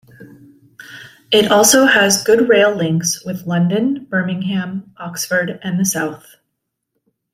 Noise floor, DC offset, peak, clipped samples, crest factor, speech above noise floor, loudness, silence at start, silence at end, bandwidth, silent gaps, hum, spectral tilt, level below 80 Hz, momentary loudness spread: -75 dBFS; under 0.1%; 0 dBFS; under 0.1%; 16 dB; 60 dB; -15 LUFS; 0.2 s; 1.15 s; 16 kHz; none; none; -3.5 dB/octave; -58 dBFS; 15 LU